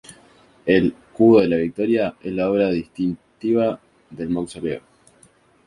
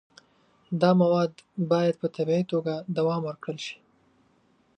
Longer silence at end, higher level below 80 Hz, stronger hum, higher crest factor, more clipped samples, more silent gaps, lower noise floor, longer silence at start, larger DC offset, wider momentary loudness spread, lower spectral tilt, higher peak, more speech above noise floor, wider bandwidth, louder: second, 0.85 s vs 1.05 s; first, -52 dBFS vs -72 dBFS; neither; about the same, 18 dB vs 18 dB; neither; neither; second, -55 dBFS vs -65 dBFS; second, 0.1 s vs 0.7 s; neither; about the same, 14 LU vs 13 LU; about the same, -7.5 dB/octave vs -7.5 dB/octave; first, -2 dBFS vs -8 dBFS; second, 36 dB vs 40 dB; first, 11.5 kHz vs 9 kHz; first, -20 LUFS vs -26 LUFS